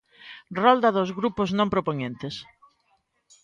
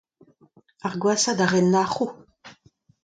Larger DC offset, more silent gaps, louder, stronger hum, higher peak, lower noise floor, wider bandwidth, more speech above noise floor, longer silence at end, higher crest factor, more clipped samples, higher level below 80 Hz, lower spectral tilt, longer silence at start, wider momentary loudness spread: neither; neither; about the same, -24 LUFS vs -22 LUFS; neither; about the same, -6 dBFS vs -6 dBFS; first, -69 dBFS vs -58 dBFS; second, 7.6 kHz vs 9.4 kHz; first, 46 dB vs 37 dB; first, 1 s vs 0.55 s; about the same, 20 dB vs 20 dB; neither; first, -58 dBFS vs -66 dBFS; first, -6.5 dB/octave vs -4.5 dB/octave; second, 0.25 s vs 0.85 s; first, 18 LU vs 11 LU